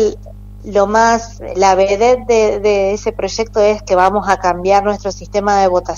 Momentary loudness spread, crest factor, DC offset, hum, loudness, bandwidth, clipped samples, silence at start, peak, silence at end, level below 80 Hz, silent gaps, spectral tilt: 8 LU; 14 dB; under 0.1%; 50 Hz at -35 dBFS; -14 LUFS; 8.2 kHz; under 0.1%; 0 s; 0 dBFS; 0 s; -34 dBFS; none; -4.5 dB/octave